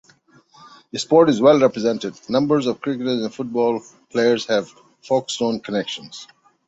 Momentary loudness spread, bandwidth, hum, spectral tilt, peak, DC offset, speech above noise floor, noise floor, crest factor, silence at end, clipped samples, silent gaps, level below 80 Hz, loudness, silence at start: 15 LU; 8 kHz; none; -5 dB/octave; -2 dBFS; under 0.1%; 35 dB; -54 dBFS; 18 dB; 0.45 s; under 0.1%; none; -62 dBFS; -20 LUFS; 0.95 s